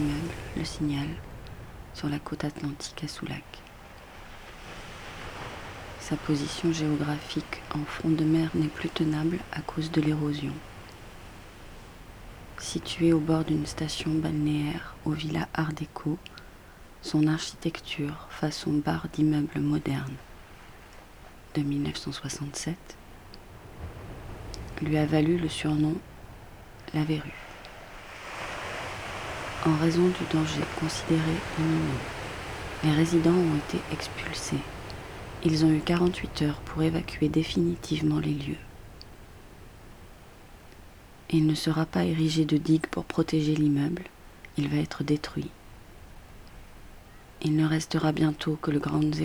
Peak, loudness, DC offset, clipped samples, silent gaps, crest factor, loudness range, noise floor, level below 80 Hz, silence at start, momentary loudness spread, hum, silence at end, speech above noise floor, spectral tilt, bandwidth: -10 dBFS; -29 LUFS; under 0.1%; under 0.1%; none; 20 dB; 8 LU; -49 dBFS; -48 dBFS; 0 s; 23 LU; none; 0 s; 22 dB; -6 dB/octave; 20 kHz